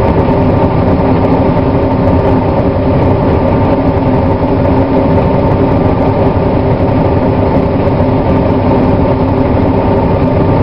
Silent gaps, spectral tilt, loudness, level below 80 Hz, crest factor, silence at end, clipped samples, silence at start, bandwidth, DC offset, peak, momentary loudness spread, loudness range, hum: none; -10.5 dB/octave; -10 LUFS; -20 dBFS; 10 dB; 0 s; 0.3%; 0 s; 5.6 kHz; 2%; 0 dBFS; 1 LU; 0 LU; none